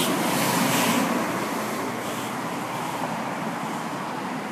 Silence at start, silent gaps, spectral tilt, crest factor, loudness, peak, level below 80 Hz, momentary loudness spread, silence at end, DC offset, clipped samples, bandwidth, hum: 0 s; none; -3.5 dB/octave; 16 dB; -26 LUFS; -10 dBFS; -66 dBFS; 9 LU; 0 s; under 0.1%; under 0.1%; 15.5 kHz; none